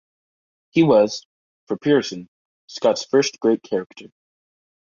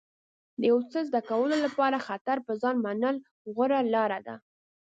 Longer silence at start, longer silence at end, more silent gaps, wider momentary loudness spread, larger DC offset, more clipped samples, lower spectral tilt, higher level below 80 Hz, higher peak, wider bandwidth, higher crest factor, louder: first, 0.75 s vs 0.6 s; first, 0.8 s vs 0.45 s; first, 1.25-1.67 s, 2.28-2.68 s, 3.86-3.90 s vs 2.21-2.25 s, 3.31-3.45 s; first, 17 LU vs 11 LU; neither; neither; about the same, -5 dB/octave vs -6 dB/octave; first, -64 dBFS vs -78 dBFS; first, -4 dBFS vs -12 dBFS; about the same, 7.4 kHz vs 7.8 kHz; about the same, 18 dB vs 16 dB; first, -20 LUFS vs -28 LUFS